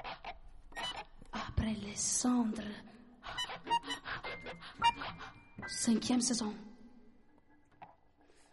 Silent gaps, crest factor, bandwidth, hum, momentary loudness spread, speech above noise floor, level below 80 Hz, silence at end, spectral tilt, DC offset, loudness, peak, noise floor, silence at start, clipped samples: none; 20 dB; 11.5 kHz; none; 19 LU; 29 dB; -56 dBFS; 0.6 s; -3 dB/octave; under 0.1%; -36 LUFS; -18 dBFS; -64 dBFS; 0 s; under 0.1%